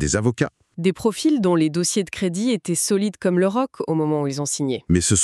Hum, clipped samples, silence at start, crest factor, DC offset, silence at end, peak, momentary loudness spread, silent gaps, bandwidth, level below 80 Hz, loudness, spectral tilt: none; under 0.1%; 0 s; 16 dB; under 0.1%; 0 s; -6 dBFS; 6 LU; none; 13.5 kHz; -44 dBFS; -21 LUFS; -4.5 dB/octave